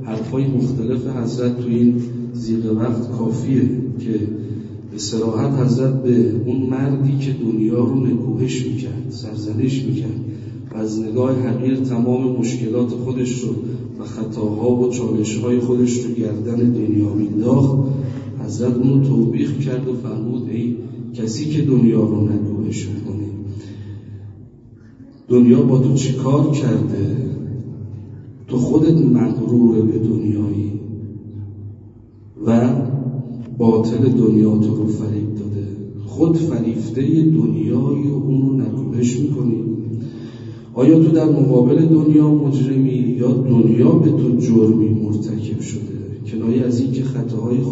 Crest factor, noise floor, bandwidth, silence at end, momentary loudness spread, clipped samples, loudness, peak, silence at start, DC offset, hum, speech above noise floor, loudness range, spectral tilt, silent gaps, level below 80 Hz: 16 dB; -43 dBFS; 8 kHz; 0 s; 15 LU; under 0.1%; -18 LUFS; 0 dBFS; 0 s; under 0.1%; none; 26 dB; 6 LU; -8.5 dB/octave; none; -52 dBFS